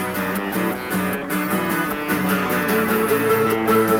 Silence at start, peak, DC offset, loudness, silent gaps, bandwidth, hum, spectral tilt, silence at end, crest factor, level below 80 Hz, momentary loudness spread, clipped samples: 0 s; -6 dBFS; under 0.1%; -20 LUFS; none; 18 kHz; none; -5 dB/octave; 0 s; 14 dB; -52 dBFS; 5 LU; under 0.1%